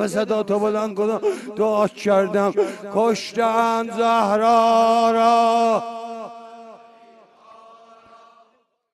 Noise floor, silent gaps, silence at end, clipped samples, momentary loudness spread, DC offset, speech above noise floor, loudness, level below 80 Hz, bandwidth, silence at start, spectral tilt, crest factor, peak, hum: -63 dBFS; none; 2.2 s; under 0.1%; 13 LU; under 0.1%; 45 dB; -19 LUFS; -64 dBFS; 13 kHz; 0 s; -5 dB/octave; 16 dB; -4 dBFS; none